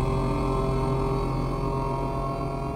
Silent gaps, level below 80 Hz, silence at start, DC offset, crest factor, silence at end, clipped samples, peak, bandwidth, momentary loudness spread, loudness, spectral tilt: none; -32 dBFS; 0 s; under 0.1%; 12 dB; 0 s; under 0.1%; -14 dBFS; 12 kHz; 3 LU; -27 LUFS; -8 dB/octave